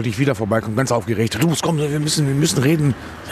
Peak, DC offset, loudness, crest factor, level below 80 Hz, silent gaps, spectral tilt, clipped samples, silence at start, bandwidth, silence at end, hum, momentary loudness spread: -2 dBFS; under 0.1%; -19 LUFS; 16 dB; -46 dBFS; none; -5 dB/octave; under 0.1%; 0 s; 14 kHz; 0 s; none; 4 LU